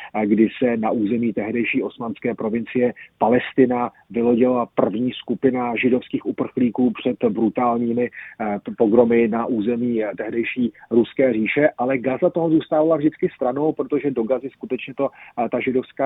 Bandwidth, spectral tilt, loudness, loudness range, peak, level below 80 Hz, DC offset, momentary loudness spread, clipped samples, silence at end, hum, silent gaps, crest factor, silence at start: 4 kHz; -10 dB/octave; -21 LUFS; 2 LU; -2 dBFS; -60 dBFS; under 0.1%; 8 LU; under 0.1%; 0 s; none; none; 18 dB; 0 s